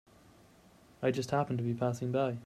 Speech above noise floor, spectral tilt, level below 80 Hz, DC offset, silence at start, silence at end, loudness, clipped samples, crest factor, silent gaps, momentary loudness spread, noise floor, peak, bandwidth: 29 dB; -7 dB/octave; -68 dBFS; under 0.1%; 1 s; 0 s; -33 LUFS; under 0.1%; 18 dB; none; 2 LU; -61 dBFS; -16 dBFS; 14 kHz